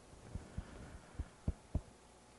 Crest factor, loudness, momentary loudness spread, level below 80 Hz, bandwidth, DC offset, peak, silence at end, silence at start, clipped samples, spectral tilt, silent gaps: 22 dB; -48 LUFS; 10 LU; -50 dBFS; 11.5 kHz; under 0.1%; -24 dBFS; 0 s; 0 s; under 0.1%; -6.5 dB/octave; none